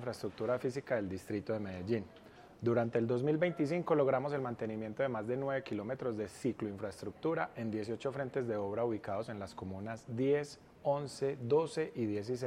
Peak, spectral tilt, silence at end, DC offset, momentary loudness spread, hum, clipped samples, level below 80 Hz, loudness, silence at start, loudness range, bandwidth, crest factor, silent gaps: -18 dBFS; -7 dB/octave; 0 s; under 0.1%; 9 LU; none; under 0.1%; -72 dBFS; -36 LUFS; 0 s; 4 LU; 14.5 kHz; 18 dB; none